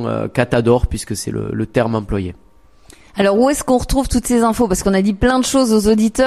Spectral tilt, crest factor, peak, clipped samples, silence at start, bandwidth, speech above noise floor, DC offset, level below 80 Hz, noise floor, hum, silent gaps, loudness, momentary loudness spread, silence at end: -5.5 dB/octave; 16 dB; 0 dBFS; under 0.1%; 0 s; 15 kHz; 31 dB; 0.3%; -30 dBFS; -46 dBFS; none; none; -16 LUFS; 9 LU; 0 s